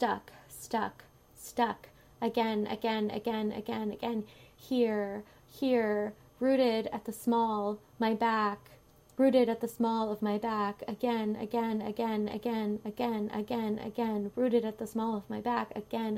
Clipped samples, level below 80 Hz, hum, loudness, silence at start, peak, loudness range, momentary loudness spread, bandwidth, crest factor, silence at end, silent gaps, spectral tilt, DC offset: under 0.1%; -68 dBFS; none; -32 LUFS; 0 s; -14 dBFS; 3 LU; 9 LU; 16 kHz; 18 dB; 0 s; none; -6 dB/octave; under 0.1%